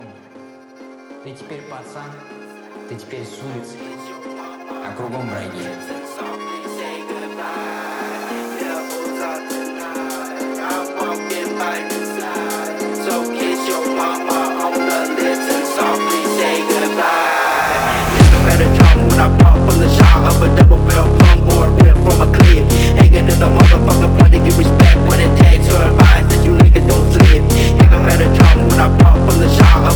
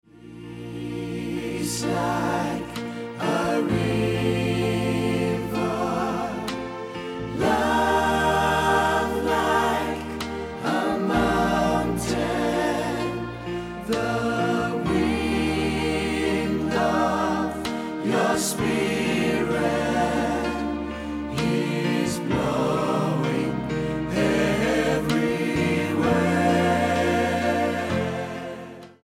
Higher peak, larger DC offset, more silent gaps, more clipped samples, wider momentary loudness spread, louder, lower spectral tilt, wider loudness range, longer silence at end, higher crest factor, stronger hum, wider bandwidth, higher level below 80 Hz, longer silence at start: first, 0 dBFS vs -8 dBFS; neither; neither; neither; first, 20 LU vs 10 LU; first, -12 LUFS vs -24 LUFS; about the same, -6 dB/octave vs -5.5 dB/octave; first, 19 LU vs 3 LU; about the same, 0 s vs 0.1 s; about the same, 12 dB vs 16 dB; neither; first, 19.5 kHz vs 16 kHz; first, -16 dBFS vs -44 dBFS; first, 1.1 s vs 0.15 s